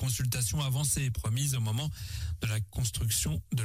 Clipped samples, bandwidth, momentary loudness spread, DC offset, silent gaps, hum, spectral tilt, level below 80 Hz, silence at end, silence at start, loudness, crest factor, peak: under 0.1%; 16 kHz; 6 LU; under 0.1%; none; none; -4 dB/octave; -44 dBFS; 0 s; 0 s; -31 LUFS; 12 dB; -18 dBFS